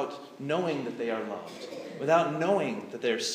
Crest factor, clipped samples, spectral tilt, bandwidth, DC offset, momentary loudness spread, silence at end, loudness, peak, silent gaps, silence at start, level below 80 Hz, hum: 18 dB; under 0.1%; -4.5 dB/octave; 15.5 kHz; under 0.1%; 15 LU; 0 s; -30 LUFS; -12 dBFS; none; 0 s; -84 dBFS; none